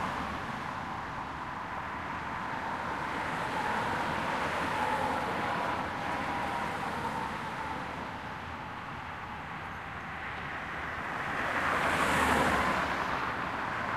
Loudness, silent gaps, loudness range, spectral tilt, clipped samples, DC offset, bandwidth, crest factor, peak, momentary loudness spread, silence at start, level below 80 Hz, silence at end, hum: -33 LUFS; none; 8 LU; -4.5 dB/octave; under 0.1%; under 0.1%; 15.5 kHz; 20 dB; -14 dBFS; 12 LU; 0 s; -52 dBFS; 0 s; none